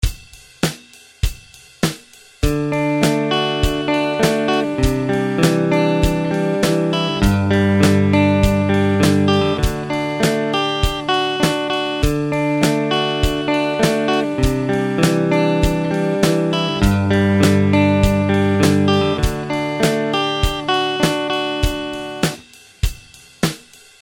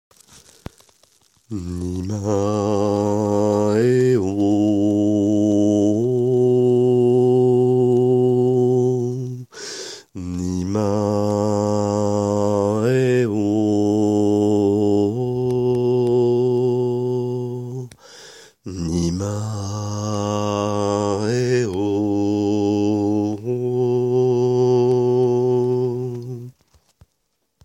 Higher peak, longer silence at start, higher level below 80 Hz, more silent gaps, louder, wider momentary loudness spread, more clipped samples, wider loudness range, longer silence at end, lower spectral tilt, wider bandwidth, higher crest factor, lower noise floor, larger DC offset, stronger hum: first, 0 dBFS vs -6 dBFS; second, 0 s vs 1.5 s; first, -28 dBFS vs -52 dBFS; neither; about the same, -17 LUFS vs -19 LUFS; second, 8 LU vs 11 LU; neither; about the same, 4 LU vs 6 LU; second, 0.45 s vs 1.15 s; second, -5.5 dB/octave vs -7.5 dB/octave; first, 17.5 kHz vs 11.5 kHz; about the same, 16 dB vs 14 dB; second, -43 dBFS vs -72 dBFS; neither; neither